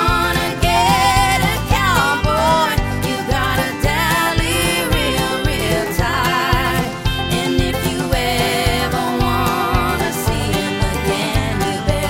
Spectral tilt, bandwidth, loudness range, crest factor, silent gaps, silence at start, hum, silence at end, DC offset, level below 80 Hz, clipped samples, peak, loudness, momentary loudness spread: -4.5 dB/octave; 16.5 kHz; 2 LU; 16 dB; none; 0 s; none; 0 s; under 0.1%; -26 dBFS; under 0.1%; 0 dBFS; -17 LUFS; 5 LU